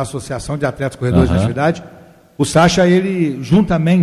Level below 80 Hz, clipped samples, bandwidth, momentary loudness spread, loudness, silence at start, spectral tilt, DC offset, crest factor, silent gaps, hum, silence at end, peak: -32 dBFS; under 0.1%; 12.5 kHz; 11 LU; -15 LUFS; 0 s; -6.5 dB/octave; under 0.1%; 12 dB; none; none; 0 s; -2 dBFS